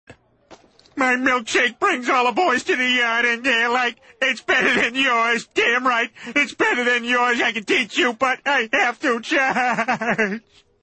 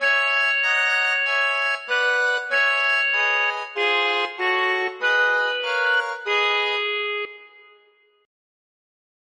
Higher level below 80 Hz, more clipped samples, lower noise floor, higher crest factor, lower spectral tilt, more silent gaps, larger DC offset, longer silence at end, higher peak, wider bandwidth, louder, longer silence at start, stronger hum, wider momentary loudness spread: first, -62 dBFS vs -84 dBFS; neither; second, -50 dBFS vs -59 dBFS; about the same, 16 dB vs 14 dB; first, -2.5 dB/octave vs 1.5 dB/octave; neither; neither; second, 0.45 s vs 1.8 s; about the same, -6 dBFS vs -8 dBFS; second, 8.8 kHz vs 11 kHz; about the same, -19 LUFS vs -20 LUFS; about the same, 0.1 s vs 0 s; neither; about the same, 5 LU vs 5 LU